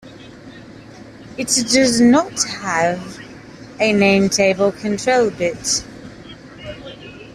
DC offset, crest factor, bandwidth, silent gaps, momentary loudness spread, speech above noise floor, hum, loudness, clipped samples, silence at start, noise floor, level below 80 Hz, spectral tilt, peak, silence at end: under 0.1%; 18 dB; 14.5 kHz; none; 24 LU; 22 dB; none; -16 LUFS; under 0.1%; 0.05 s; -39 dBFS; -50 dBFS; -3.5 dB/octave; -2 dBFS; 0.05 s